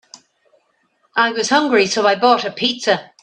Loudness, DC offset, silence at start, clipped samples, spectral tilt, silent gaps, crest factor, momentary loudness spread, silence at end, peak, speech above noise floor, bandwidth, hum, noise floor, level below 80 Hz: -16 LUFS; under 0.1%; 1.15 s; under 0.1%; -2.5 dB/octave; none; 18 dB; 5 LU; 0.2 s; 0 dBFS; 47 dB; 10 kHz; none; -63 dBFS; -66 dBFS